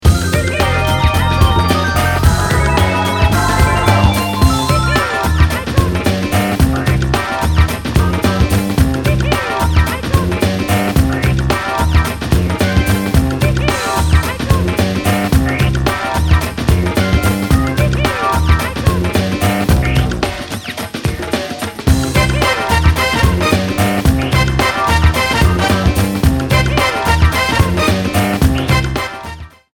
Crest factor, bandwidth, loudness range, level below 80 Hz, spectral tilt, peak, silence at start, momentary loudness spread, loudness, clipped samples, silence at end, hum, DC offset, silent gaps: 12 dB; 19.5 kHz; 2 LU; -20 dBFS; -5.5 dB/octave; 0 dBFS; 0 s; 3 LU; -14 LUFS; under 0.1%; 0.3 s; none; under 0.1%; none